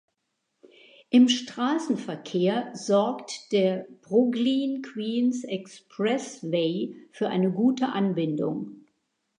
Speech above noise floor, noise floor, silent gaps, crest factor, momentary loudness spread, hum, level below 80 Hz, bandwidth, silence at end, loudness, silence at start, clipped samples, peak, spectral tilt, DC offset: 53 dB; -79 dBFS; none; 16 dB; 10 LU; none; -80 dBFS; 10 kHz; 0.65 s; -26 LUFS; 1.1 s; under 0.1%; -10 dBFS; -5.5 dB/octave; under 0.1%